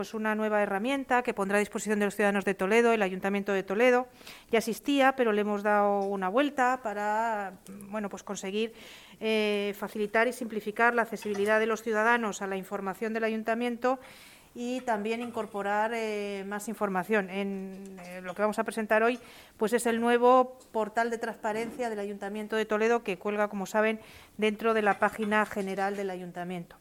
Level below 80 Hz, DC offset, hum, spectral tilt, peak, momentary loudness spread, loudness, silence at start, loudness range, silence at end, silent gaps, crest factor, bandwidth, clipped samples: -66 dBFS; under 0.1%; none; -4.5 dB/octave; -10 dBFS; 11 LU; -29 LUFS; 0 s; 5 LU; 0.05 s; none; 20 dB; 18 kHz; under 0.1%